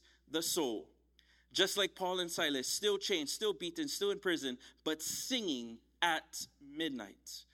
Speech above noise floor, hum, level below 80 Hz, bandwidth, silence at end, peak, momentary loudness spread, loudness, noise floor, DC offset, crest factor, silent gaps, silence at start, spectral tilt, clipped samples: 32 dB; none; -74 dBFS; 16.5 kHz; 0.1 s; -16 dBFS; 12 LU; -36 LUFS; -69 dBFS; under 0.1%; 22 dB; none; 0.3 s; -1.5 dB/octave; under 0.1%